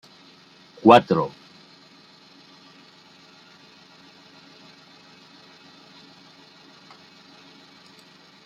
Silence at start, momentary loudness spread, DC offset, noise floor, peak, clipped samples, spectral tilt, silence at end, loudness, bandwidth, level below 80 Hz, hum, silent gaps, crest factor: 0.85 s; 33 LU; under 0.1%; -52 dBFS; -2 dBFS; under 0.1%; -6.5 dB/octave; 7.2 s; -18 LUFS; 11 kHz; -68 dBFS; none; none; 26 dB